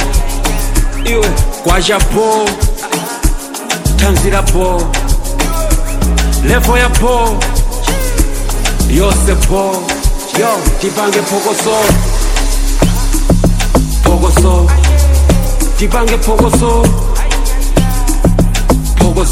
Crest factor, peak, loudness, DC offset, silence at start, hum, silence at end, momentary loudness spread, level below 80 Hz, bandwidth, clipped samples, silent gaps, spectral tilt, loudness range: 10 dB; 0 dBFS; -12 LUFS; under 0.1%; 0 s; none; 0 s; 6 LU; -12 dBFS; 16.5 kHz; under 0.1%; none; -4.5 dB/octave; 3 LU